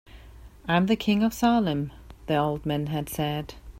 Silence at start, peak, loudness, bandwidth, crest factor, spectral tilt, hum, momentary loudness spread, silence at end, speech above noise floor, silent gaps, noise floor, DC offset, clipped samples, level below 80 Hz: 0.1 s; -8 dBFS; -26 LUFS; 16 kHz; 18 dB; -6 dB/octave; none; 11 LU; 0 s; 22 dB; none; -47 dBFS; under 0.1%; under 0.1%; -48 dBFS